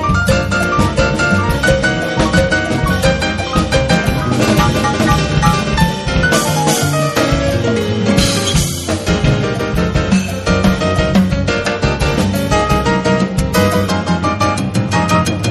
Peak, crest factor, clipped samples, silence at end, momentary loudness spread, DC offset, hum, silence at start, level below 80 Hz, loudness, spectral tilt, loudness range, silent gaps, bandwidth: 0 dBFS; 14 dB; under 0.1%; 0 s; 3 LU; under 0.1%; none; 0 s; -24 dBFS; -14 LUFS; -5 dB/octave; 1 LU; none; 13.5 kHz